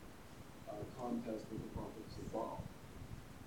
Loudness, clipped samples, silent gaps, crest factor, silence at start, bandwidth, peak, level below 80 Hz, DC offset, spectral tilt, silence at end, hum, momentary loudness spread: -48 LUFS; under 0.1%; none; 16 dB; 0 s; 19 kHz; -30 dBFS; -60 dBFS; 0.1%; -6.5 dB/octave; 0 s; none; 11 LU